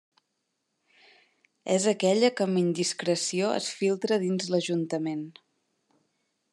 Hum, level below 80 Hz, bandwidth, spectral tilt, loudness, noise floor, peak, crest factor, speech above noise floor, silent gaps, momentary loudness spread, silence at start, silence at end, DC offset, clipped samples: none; -84 dBFS; 12 kHz; -4.5 dB/octave; -27 LUFS; -79 dBFS; -10 dBFS; 18 dB; 53 dB; none; 8 LU; 1.65 s; 1.2 s; under 0.1%; under 0.1%